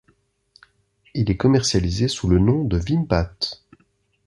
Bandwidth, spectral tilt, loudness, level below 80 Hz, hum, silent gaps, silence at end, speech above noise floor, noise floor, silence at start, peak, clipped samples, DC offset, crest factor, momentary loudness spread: 11.5 kHz; -6 dB/octave; -20 LUFS; -34 dBFS; none; none; 0.7 s; 45 dB; -64 dBFS; 1.15 s; -2 dBFS; under 0.1%; under 0.1%; 20 dB; 10 LU